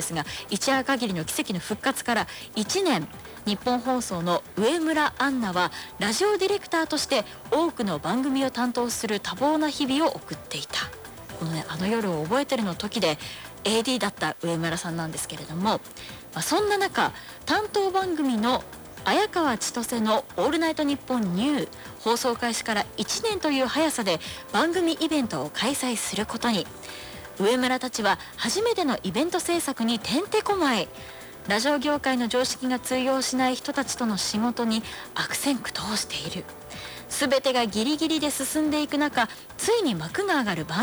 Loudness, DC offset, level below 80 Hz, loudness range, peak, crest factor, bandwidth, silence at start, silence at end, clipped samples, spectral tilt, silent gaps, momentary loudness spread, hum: -26 LUFS; under 0.1%; -56 dBFS; 2 LU; -12 dBFS; 14 dB; over 20 kHz; 0 s; 0 s; under 0.1%; -3.5 dB/octave; none; 8 LU; none